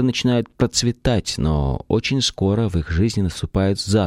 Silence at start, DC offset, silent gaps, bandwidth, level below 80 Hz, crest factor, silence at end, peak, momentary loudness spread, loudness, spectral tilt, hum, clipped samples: 0 s; under 0.1%; none; 14.5 kHz; -32 dBFS; 16 dB; 0 s; -4 dBFS; 3 LU; -20 LUFS; -5.5 dB/octave; none; under 0.1%